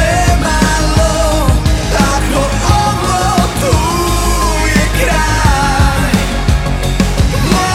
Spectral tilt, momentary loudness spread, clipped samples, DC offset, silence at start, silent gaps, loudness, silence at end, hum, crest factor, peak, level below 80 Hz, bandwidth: -4.5 dB/octave; 2 LU; under 0.1%; under 0.1%; 0 s; none; -12 LUFS; 0 s; none; 10 dB; 0 dBFS; -16 dBFS; 16 kHz